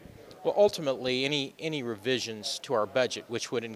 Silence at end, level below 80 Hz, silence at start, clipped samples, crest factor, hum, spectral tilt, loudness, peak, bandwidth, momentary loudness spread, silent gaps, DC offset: 0 s; -68 dBFS; 0 s; under 0.1%; 18 dB; none; -3.5 dB/octave; -29 LUFS; -12 dBFS; 15.5 kHz; 9 LU; none; under 0.1%